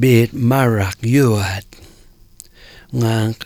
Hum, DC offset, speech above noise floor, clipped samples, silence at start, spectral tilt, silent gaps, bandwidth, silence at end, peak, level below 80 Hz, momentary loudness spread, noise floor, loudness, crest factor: none; under 0.1%; 31 dB; under 0.1%; 0 s; -6.5 dB/octave; none; 17.5 kHz; 0 s; 0 dBFS; -46 dBFS; 9 LU; -46 dBFS; -16 LUFS; 16 dB